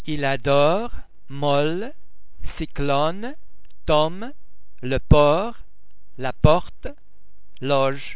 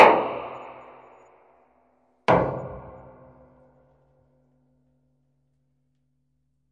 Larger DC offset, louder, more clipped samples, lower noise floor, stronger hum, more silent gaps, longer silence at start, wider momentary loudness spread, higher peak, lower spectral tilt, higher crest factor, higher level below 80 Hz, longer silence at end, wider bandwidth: first, 5% vs under 0.1%; first, -21 LUFS vs -24 LUFS; neither; second, -47 dBFS vs -73 dBFS; neither; neither; about the same, 0.05 s vs 0 s; second, 19 LU vs 25 LU; about the same, 0 dBFS vs 0 dBFS; first, -10.5 dB/octave vs -6.5 dB/octave; second, 22 dB vs 28 dB; first, -34 dBFS vs -56 dBFS; second, 0 s vs 3.9 s; second, 4 kHz vs 9.8 kHz